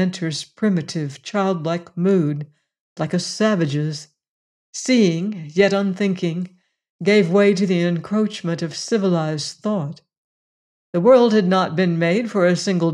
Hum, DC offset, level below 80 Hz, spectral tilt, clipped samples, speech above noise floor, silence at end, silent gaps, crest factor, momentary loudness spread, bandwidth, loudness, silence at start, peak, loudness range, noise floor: none; under 0.1%; -68 dBFS; -6 dB/octave; under 0.1%; over 71 dB; 0 s; 2.80-2.96 s, 4.28-4.73 s, 6.90-6.99 s, 10.18-10.93 s; 16 dB; 11 LU; 11 kHz; -19 LUFS; 0 s; -4 dBFS; 4 LU; under -90 dBFS